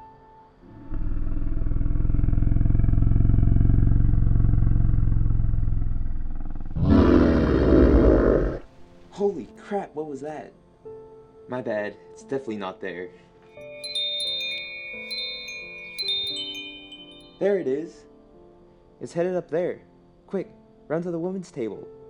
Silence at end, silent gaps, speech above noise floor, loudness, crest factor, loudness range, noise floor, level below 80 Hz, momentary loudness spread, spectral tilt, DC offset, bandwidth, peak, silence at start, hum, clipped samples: 0 s; none; 24 dB; -25 LUFS; 18 dB; 12 LU; -53 dBFS; -26 dBFS; 19 LU; -7.5 dB/octave; under 0.1%; 11 kHz; -4 dBFS; 0 s; none; under 0.1%